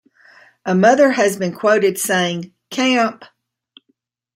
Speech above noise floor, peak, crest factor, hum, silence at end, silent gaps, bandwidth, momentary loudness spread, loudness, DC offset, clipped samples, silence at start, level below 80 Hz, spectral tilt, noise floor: 51 dB; -2 dBFS; 16 dB; none; 1.1 s; none; 16 kHz; 11 LU; -16 LUFS; under 0.1%; under 0.1%; 0.65 s; -68 dBFS; -4.5 dB/octave; -67 dBFS